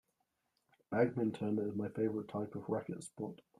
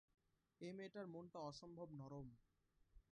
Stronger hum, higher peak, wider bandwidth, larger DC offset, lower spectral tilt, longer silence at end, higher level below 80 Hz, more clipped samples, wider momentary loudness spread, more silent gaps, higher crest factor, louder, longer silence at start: neither; first, -18 dBFS vs -40 dBFS; first, 12 kHz vs 10 kHz; neither; about the same, -7.5 dB/octave vs -6.5 dB/octave; first, 0.25 s vs 0.1 s; about the same, -76 dBFS vs -78 dBFS; neither; first, 11 LU vs 4 LU; neither; about the same, 20 dB vs 18 dB; first, -38 LUFS vs -56 LUFS; first, 0.9 s vs 0.6 s